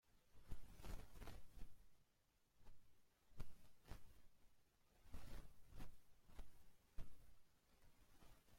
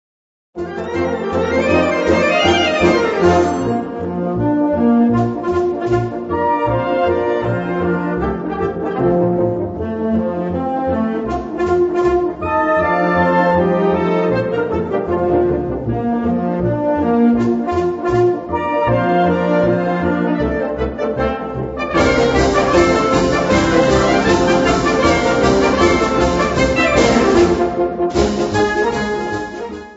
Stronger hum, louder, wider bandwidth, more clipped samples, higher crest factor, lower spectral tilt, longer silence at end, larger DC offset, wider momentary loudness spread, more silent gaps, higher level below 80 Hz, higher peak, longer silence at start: neither; second, -65 LUFS vs -16 LUFS; first, 16.5 kHz vs 8 kHz; neither; about the same, 18 dB vs 14 dB; about the same, -5 dB/octave vs -6 dB/octave; about the same, 0 s vs 0 s; neither; about the same, 8 LU vs 7 LU; neither; second, -62 dBFS vs -34 dBFS; second, -36 dBFS vs 0 dBFS; second, 0.15 s vs 0.55 s